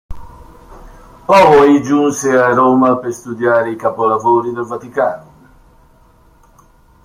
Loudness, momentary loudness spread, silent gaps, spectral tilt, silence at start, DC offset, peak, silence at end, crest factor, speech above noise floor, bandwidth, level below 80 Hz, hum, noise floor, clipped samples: -12 LUFS; 14 LU; none; -5.5 dB/octave; 0.1 s; under 0.1%; 0 dBFS; 1.85 s; 14 dB; 36 dB; 15.5 kHz; -42 dBFS; none; -47 dBFS; under 0.1%